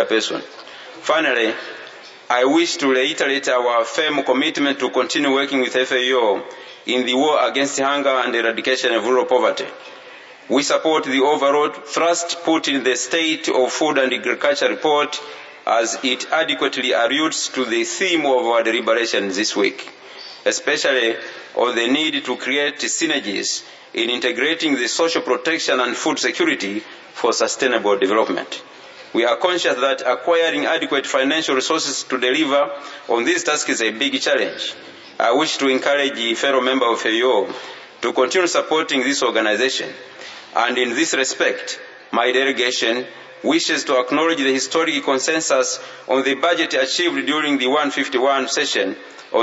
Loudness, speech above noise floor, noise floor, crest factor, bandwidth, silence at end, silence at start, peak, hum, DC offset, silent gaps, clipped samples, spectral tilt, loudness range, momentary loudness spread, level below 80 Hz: -18 LUFS; 22 dB; -40 dBFS; 18 dB; 8 kHz; 0 s; 0 s; 0 dBFS; none; under 0.1%; none; under 0.1%; -1.5 dB/octave; 2 LU; 10 LU; -76 dBFS